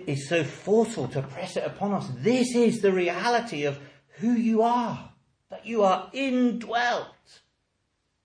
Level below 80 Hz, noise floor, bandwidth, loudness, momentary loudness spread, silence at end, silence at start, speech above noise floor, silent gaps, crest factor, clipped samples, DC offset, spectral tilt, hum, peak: -68 dBFS; -75 dBFS; 10.5 kHz; -26 LUFS; 10 LU; 1.15 s; 0 s; 50 dB; none; 16 dB; under 0.1%; under 0.1%; -5.5 dB/octave; none; -10 dBFS